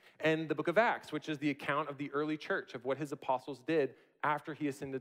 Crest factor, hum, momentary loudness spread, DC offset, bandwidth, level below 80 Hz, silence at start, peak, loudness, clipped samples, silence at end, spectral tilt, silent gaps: 20 dB; none; 8 LU; under 0.1%; 15.5 kHz; -80 dBFS; 0.2 s; -16 dBFS; -35 LUFS; under 0.1%; 0 s; -6 dB/octave; none